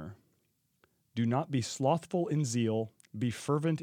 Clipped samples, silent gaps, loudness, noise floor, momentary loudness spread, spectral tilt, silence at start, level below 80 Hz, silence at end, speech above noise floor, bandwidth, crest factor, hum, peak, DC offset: under 0.1%; none; -32 LUFS; -76 dBFS; 8 LU; -6 dB/octave; 0 s; -76 dBFS; 0 s; 45 dB; 15.5 kHz; 18 dB; none; -16 dBFS; under 0.1%